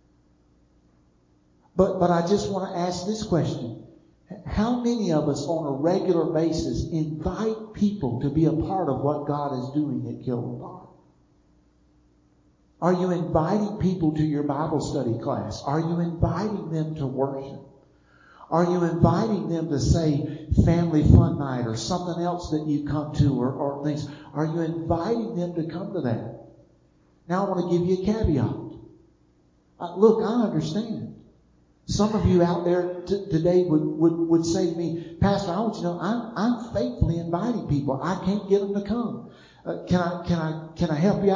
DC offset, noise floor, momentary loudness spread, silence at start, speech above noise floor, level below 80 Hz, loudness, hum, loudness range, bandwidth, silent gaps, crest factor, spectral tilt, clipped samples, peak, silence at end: under 0.1%; -61 dBFS; 10 LU; 1.75 s; 37 dB; -40 dBFS; -25 LUFS; none; 6 LU; 7.6 kHz; none; 22 dB; -7.5 dB/octave; under 0.1%; -2 dBFS; 0 s